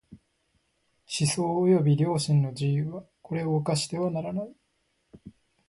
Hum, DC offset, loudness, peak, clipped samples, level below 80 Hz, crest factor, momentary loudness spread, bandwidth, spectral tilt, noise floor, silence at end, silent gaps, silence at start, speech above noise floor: none; under 0.1%; -27 LUFS; -12 dBFS; under 0.1%; -64 dBFS; 16 dB; 13 LU; 11.5 kHz; -6 dB/octave; -73 dBFS; 0.4 s; none; 0.1 s; 48 dB